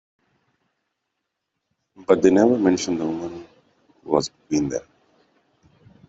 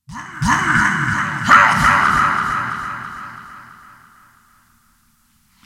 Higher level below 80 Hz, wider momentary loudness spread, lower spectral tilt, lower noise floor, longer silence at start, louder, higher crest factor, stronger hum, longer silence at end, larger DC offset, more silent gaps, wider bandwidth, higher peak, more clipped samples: second, -58 dBFS vs -40 dBFS; second, 17 LU vs 21 LU; first, -5.5 dB/octave vs -3.5 dB/octave; first, -79 dBFS vs -58 dBFS; first, 2 s vs 0.1 s; second, -21 LUFS vs -15 LUFS; about the same, 20 dB vs 18 dB; neither; second, 1.3 s vs 1.95 s; neither; neither; second, 8 kHz vs 17 kHz; second, -4 dBFS vs 0 dBFS; neither